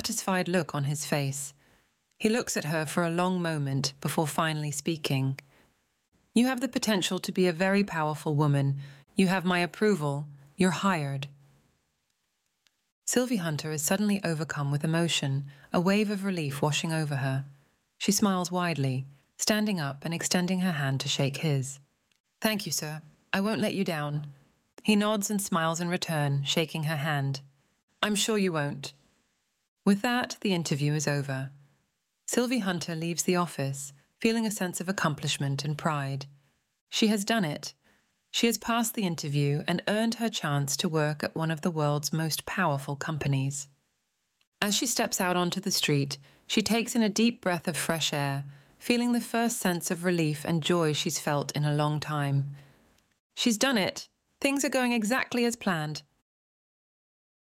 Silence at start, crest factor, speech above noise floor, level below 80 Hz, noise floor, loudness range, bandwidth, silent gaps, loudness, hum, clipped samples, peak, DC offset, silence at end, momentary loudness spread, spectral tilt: 0 s; 20 dB; 50 dB; -68 dBFS; -78 dBFS; 3 LU; 16.5 kHz; 6.08-6.12 s, 12.92-13.02 s, 22.20-22.24 s, 27.83-27.88 s, 29.68-29.77 s, 36.81-36.87 s, 44.47-44.52 s, 53.20-53.30 s; -28 LUFS; none; under 0.1%; -8 dBFS; under 0.1%; 1.4 s; 8 LU; -4.5 dB/octave